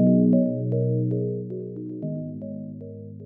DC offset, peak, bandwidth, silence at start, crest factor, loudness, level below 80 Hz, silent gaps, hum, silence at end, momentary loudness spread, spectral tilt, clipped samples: under 0.1%; -8 dBFS; 1.1 kHz; 0 s; 16 dB; -25 LUFS; -64 dBFS; none; none; 0 s; 17 LU; -15.5 dB/octave; under 0.1%